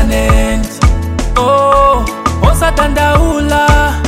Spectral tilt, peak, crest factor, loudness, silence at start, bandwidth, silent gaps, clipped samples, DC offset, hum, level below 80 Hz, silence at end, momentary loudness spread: -5.5 dB/octave; 0 dBFS; 10 dB; -11 LUFS; 0 s; 16 kHz; none; under 0.1%; under 0.1%; none; -14 dBFS; 0 s; 5 LU